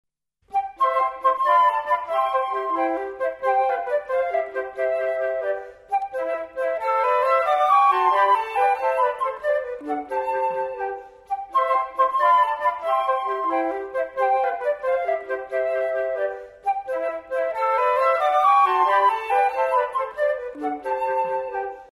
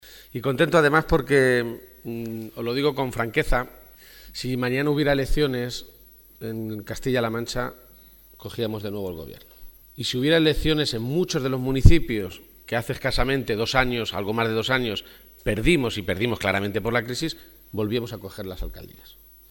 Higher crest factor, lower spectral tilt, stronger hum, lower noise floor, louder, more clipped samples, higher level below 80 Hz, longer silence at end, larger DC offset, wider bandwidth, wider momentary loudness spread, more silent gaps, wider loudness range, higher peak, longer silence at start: second, 14 dB vs 24 dB; second, -3.5 dB/octave vs -5.5 dB/octave; neither; first, -54 dBFS vs -50 dBFS; about the same, -22 LUFS vs -24 LUFS; neither; second, -62 dBFS vs -34 dBFS; second, 0.1 s vs 0.6 s; neither; second, 13.5 kHz vs 19 kHz; second, 10 LU vs 16 LU; neither; about the same, 5 LU vs 7 LU; second, -8 dBFS vs 0 dBFS; first, 0.5 s vs 0.05 s